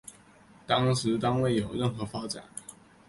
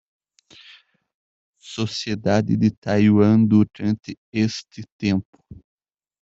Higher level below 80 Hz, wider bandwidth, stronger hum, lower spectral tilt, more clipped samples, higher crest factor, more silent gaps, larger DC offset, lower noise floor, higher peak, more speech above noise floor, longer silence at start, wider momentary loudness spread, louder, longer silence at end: about the same, -58 dBFS vs -56 dBFS; first, 11.5 kHz vs 7.8 kHz; neither; second, -5.5 dB/octave vs -7 dB/octave; neither; about the same, 20 dB vs 18 dB; second, none vs 2.77-2.82 s, 4.18-4.32 s, 4.92-4.99 s, 5.25-5.33 s; neither; first, -56 dBFS vs -51 dBFS; second, -10 dBFS vs -4 dBFS; second, 28 dB vs 32 dB; second, 0.05 s vs 1.65 s; first, 17 LU vs 13 LU; second, -29 LUFS vs -20 LUFS; second, 0.35 s vs 0.65 s